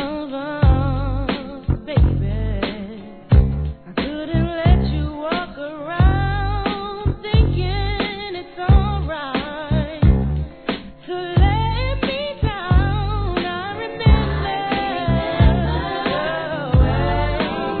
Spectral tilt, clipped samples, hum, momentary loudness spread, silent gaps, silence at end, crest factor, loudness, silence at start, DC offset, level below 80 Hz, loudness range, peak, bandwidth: -10.5 dB/octave; under 0.1%; none; 10 LU; none; 0 s; 18 dB; -20 LUFS; 0 s; 0.3%; -22 dBFS; 2 LU; 0 dBFS; 4.5 kHz